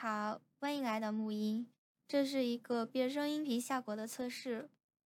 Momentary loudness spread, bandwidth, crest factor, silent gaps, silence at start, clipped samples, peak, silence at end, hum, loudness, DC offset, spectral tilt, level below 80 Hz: 7 LU; 17.5 kHz; 16 dB; 1.78-1.95 s; 0 s; under 0.1%; -24 dBFS; 0.4 s; none; -38 LUFS; under 0.1%; -4.5 dB/octave; under -90 dBFS